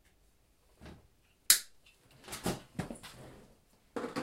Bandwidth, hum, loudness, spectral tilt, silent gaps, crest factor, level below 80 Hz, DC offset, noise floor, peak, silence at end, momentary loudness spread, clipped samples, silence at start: 16 kHz; none; -32 LUFS; -1.5 dB/octave; none; 34 dB; -62 dBFS; under 0.1%; -69 dBFS; -6 dBFS; 0 s; 29 LU; under 0.1%; 0.8 s